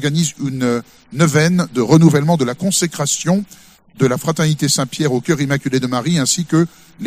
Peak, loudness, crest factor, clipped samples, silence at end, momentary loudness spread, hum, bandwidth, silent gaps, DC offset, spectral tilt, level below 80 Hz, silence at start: 0 dBFS; -16 LUFS; 16 dB; under 0.1%; 0 s; 7 LU; none; 15.5 kHz; none; under 0.1%; -5 dB/octave; -52 dBFS; 0 s